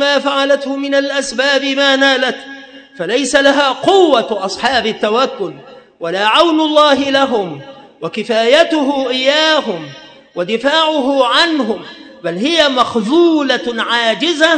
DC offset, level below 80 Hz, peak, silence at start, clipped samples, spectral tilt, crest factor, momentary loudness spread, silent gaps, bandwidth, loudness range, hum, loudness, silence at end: under 0.1%; -54 dBFS; 0 dBFS; 0 s; 0.2%; -3 dB/octave; 14 dB; 14 LU; none; 11 kHz; 2 LU; none; -13 LUFS; 0 s